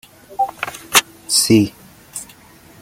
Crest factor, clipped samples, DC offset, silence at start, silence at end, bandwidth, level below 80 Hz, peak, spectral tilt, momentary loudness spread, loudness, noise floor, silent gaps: 20 dB; under 0.1%; under 0.1%; 0.3 s; 0.55 s; 17 kHz; -54 dBFS; 0 dBFS; -3 dB/octave; 19 LU; -16 LUFS; -45 dBFS; none